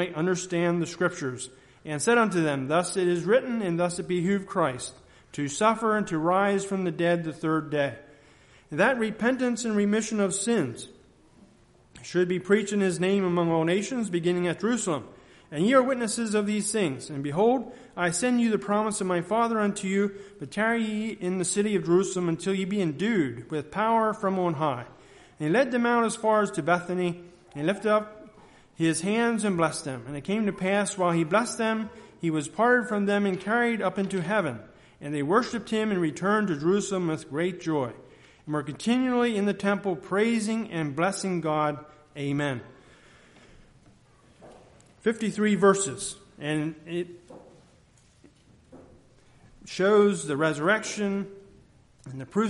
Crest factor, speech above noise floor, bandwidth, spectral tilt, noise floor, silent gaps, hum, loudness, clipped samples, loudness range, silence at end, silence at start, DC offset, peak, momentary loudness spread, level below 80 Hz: 20 dB; 33 dB; 11.5 kHz; -5 dB/octave; -59 dBFS; none; none; -26 LUFS; under 0.1%; 3 LU; 0 s; 0 s; under 0.1%; -8 dBFS; 11 LU; -64 dBFS